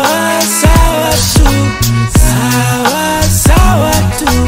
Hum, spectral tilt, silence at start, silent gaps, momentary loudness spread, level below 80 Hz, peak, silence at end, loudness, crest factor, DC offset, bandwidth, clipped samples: none; -4.5 dB/octave; 0 s; none; 3 LU; -14 dBFS; 0 dBFS; 0 s; -10 LUFS; 8 dB; under 0.1%; 16.5 kHz; 0.3%